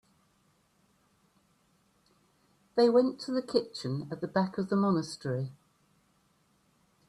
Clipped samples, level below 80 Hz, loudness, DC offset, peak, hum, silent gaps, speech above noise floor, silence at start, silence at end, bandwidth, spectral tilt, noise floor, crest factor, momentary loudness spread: under 0.1%; -74 dBFS; -30 LUFS; under 0.1%; -12 dBFS; none; none; 41 dB; 2.75 s; 1.55 s; 11.5 kHz; -6.5 dB/octave; -70 dBFS; 20 dB; 12 LU